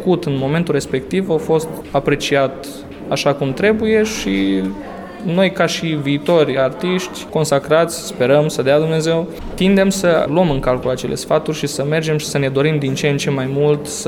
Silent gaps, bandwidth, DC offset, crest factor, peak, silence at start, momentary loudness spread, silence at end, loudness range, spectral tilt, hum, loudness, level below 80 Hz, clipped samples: none; 17 kHz; under 0.1%; 14 dB; -2 dBFS; 0 s; 7 LU; 0 s; 2 LU; -5.5 dB/octave; none; -17 LUFS; -40 dBFS; under 0.1%